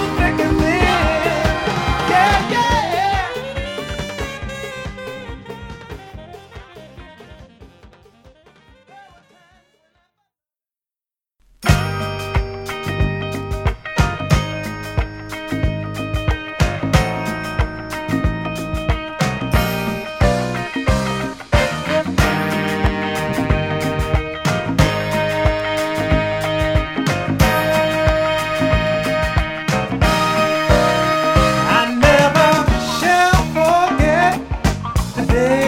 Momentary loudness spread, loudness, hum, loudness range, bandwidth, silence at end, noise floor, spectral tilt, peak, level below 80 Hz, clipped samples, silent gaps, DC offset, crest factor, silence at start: 11 LU; -18 LUFS; none; 12 LU; 17 kHz; 0 s; under -90 dBFS; -5.5 dB/octave; 0 dBFS; -26 dBFS; under 0.1%; none; under 0.1%; 18 dB; 0 s